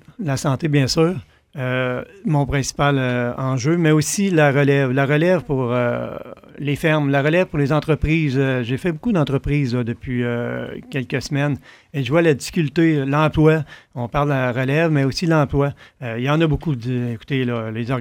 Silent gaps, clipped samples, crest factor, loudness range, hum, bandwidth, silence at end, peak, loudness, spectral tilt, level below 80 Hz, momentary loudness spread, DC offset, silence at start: none; under 0.1%; 16 dB; 4 LU; none; 16.5 kHz; 0 s; -2 dBFS; -19 LUFS; -6 dB/octave; -40 dBFS; 10 LU; under 0.1%; 0.2 s